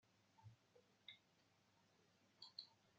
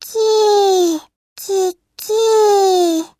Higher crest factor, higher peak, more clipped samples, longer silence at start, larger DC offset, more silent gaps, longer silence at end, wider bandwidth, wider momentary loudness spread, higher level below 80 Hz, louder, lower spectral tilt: first, 30 dB vs 12 dB; second, -38 dBFS vs -4 dBFS; neither; about the same, 0 s vs 0 s; neither; second, none vs 1.16-1.36 s; second, 0 s vs 0.15 s; second, 7.4 kHz vs 15.5 kHz; about the same, 11 LU vs 11 LU; second, under -90 dBFS vs -68 dBFS; second, -62 LUFS vs -14 LUFS; about the same, -1.5 dB/octave vs -1.5 dB/octave